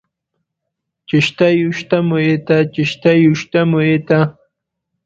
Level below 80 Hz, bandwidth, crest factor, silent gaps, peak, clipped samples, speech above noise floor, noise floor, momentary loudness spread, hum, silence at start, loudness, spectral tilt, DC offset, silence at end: -54 dBFS; 7.6 kHz; 16 dB; none; 0 dBFS; under 0.1%; 64 dB; -77 dBFS; 4 LU; none; 1.1 s; -14 LUFS; -7 dB/octave; under 0.1%; 0.75 s